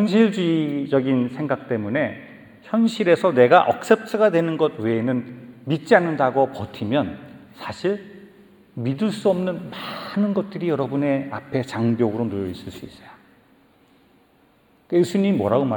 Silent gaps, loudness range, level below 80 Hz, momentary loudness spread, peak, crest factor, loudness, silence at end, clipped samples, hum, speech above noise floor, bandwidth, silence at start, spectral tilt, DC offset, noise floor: none; 8 LU; -64 dBFS; 13 LU; -2 dBFS; 20 dB; -21 LUFS; 0 s; under 0.1%; none; 37 dB; 19 kHz; 0 s; -7 dB/octave; under 0.1%; -58 dBFS